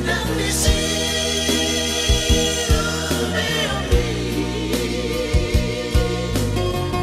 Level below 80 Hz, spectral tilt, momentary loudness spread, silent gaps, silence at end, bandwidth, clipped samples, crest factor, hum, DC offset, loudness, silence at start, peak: -26 dBFS; -4 dB/octave; 5 LU; none; 0 s; 15.5 kHz; under 0.1%; 16 dB; none; under 0.1%; -20 LUFS; 0 s; -4 dBFS